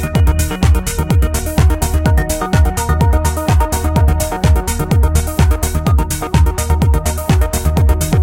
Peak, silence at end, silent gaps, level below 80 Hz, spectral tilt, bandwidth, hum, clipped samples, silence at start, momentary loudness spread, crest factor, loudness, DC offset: 0 dBFS; 0 s; none; -16 dBFS; -5.5 dB/octave; 16.5 kHz; none; under 0.1%; 0 s; 2 LU; 12 dB; -14 LUFS; under 0.1%